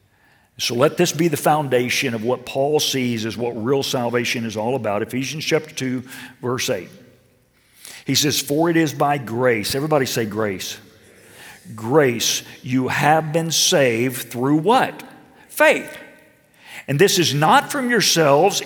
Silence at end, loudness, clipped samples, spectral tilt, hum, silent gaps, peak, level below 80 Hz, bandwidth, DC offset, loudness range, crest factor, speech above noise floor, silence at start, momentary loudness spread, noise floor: 0 s; -19 LUFS; under 0.1%; -3.5 dB/octave; none; none; -2 dBFS; -64 dBFS; 19.5 kHz; under 0.1%; 5 LU; 18 dB; 39 dB; 0.6 s; 13 LU; -58 dBFS